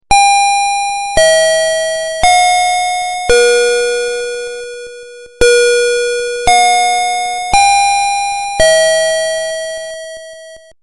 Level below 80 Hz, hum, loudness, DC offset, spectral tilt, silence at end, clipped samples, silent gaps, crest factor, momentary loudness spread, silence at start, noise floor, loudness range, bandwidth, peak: -34 dBFS; none; -11 LUFS; under 0.1%; 0 dB/octave; 0.25 s; under 0.1%; none; 12 dB; 15 LU; 0.1 s; -35 dBFS; 2 LU; 11.5 kHz; 0 dBFS